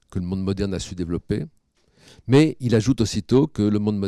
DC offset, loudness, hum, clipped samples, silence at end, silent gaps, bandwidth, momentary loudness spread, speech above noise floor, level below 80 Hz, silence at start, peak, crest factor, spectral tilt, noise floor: under 0.1%; -22 LUFS; none; under 0.1%; 0 s; none; 12.5 kHz; 11 LU; 37 dB; -44 dBFS; 0.1 s; -6 dBFS; 16 dB; -7 dB/octave; -58 dBFS